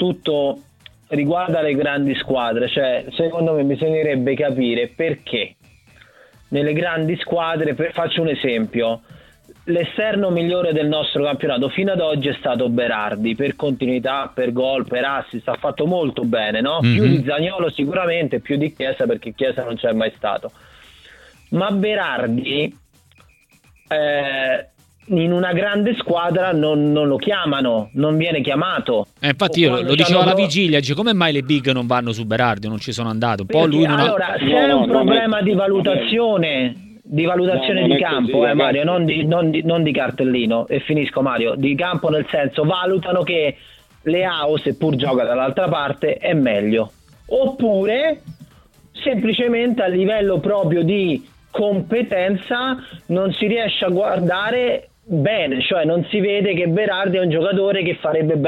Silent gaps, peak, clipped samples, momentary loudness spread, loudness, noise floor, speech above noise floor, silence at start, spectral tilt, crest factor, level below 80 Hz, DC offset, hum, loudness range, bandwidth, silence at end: none; 0 dBFS; under 0.1%; 6 LU; -18 LUFS; -54 dBFS; 36 dB; 0 s; -6.5 dB/octave; 18 dB; -54 dBFS; under 0.1%; none; 5 LU; 12.5 kHz; 0 s